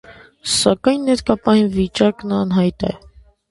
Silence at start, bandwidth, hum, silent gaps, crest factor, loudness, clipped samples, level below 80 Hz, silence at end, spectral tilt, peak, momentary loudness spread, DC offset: 0.1 s; 11.5 kHz; none; none; 18 dB; -17 LUFS; under 0.1%; -42 dBFS; 0.55 s; -5 dB/octave; 0 dBFS; 10 LU; under 0.1%